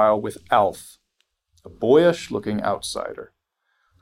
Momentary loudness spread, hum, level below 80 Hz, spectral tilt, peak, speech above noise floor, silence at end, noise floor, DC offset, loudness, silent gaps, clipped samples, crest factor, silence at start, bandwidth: 16 LU; none; -58 dBFS; -5 dB/octave; -4 dBFS; 51 dB; 0.75 s; -72 dBFS; under 0.1%; -21 LUFS; none; under 0.1%; 18 dB; 0 s; 16 kHz